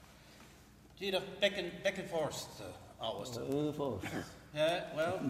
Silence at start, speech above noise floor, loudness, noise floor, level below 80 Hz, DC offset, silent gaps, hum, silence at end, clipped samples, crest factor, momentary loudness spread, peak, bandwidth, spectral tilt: 0 s; 22 dB; -38 LUFS; -59 dBFS; -66 dBFS; under 0.1%; none; none; 0 s; under 0.1%; 22 dB; 19 LU; -16 dBFS; 16 kHz; -4.5 dB/octave